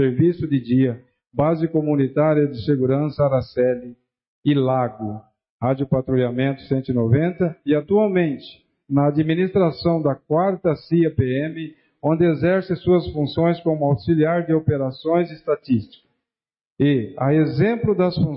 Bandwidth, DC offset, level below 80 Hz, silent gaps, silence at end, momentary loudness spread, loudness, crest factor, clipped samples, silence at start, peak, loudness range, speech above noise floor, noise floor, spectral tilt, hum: 5.6 kHz; under 0.1%; -50 dBFS; 4.28-4.43 s, 5.50-5.59 s, 16.67-16.76 s; 0 s; 6 LU; -20 LUFS; 14 dB; under 0.1%; 0 s; -6 dBFS; 2 LU; over 71 dB; under -90 dBFS; -13 dB/octave; none